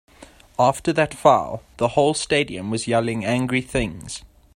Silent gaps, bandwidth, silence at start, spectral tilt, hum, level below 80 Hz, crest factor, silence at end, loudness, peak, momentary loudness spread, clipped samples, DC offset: none; 16 kHz; 0.2 s; -5 dB/octave; none; -46 dBFS; 22 dB; 0.3 s; -21 LUFS; 0 dBFS; 15 LU; under 0.1%; under 0.1%